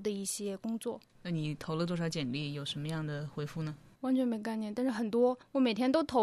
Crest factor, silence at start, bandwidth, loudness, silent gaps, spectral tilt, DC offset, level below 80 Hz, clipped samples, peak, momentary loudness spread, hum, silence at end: 18 dB; 0 s; 13.5 kHz; -34 LUFS; none; -5.5 dB/octave; under 0.1%; -66 dBFS; under 0.1%; -16 dBFS; 9 LU; none; 0 s